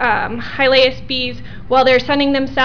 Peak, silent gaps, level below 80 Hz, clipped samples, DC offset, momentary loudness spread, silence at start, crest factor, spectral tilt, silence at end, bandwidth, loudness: -4 dBFS; none; -38 dBFS; under 0.1%; 3%; 11 LU; 0 s; 12 dB; -5.5 dB/octave; 0 s; 5.4 kHz; -15 LUFS